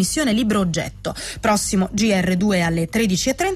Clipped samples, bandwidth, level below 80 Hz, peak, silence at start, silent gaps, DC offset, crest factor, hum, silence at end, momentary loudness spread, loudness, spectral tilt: under 0.1%; 15 kHz; -40 dBFS; -8 dBFS; 0 s; none; under 0.1%; 12 dB; none; 0 s; 6 LU; -20 LUFS; -4.5 dB/octave